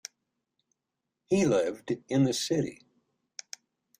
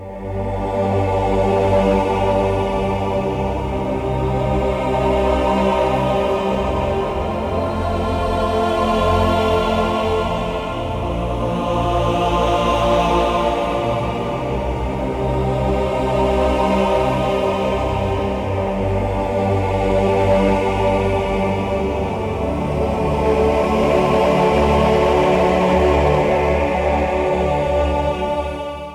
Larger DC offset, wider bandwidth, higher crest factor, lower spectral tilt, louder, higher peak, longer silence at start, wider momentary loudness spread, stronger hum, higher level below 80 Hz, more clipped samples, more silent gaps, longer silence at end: neither; about the same, 15.5 kHz vs 15 kHz; about the same, 18 dB vs 14 dB; second, -5.5 dB/octave vs -7 dB/octave; second, -28 LUFS vs -18 LUFS; second, -14 dBFS vs -2 dBFS; first, 1.3 s vs 0 s; first, 21 LU vs 7 LU; neither; second, -66 dBFS vs -28 dBFS; neither; neither; first, 1.25 s vs 0 s